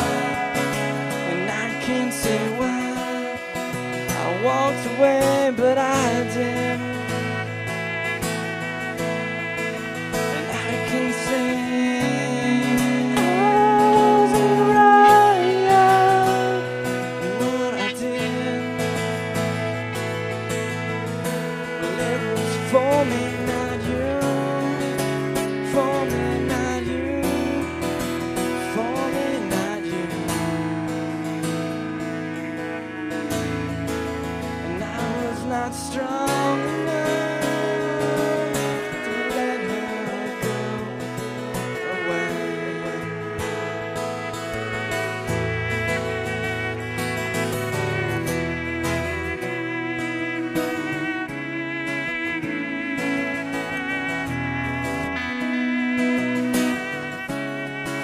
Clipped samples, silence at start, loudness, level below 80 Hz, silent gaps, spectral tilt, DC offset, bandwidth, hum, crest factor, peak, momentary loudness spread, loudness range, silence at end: under 0.1%; 0 s; -23 LUFS; -48 dBFS; none; -5 dB/octave; under 0.1%; 15.5 kHz; none; 20 dB; -2 dBFS; 10 LU; 10 LU; 0 s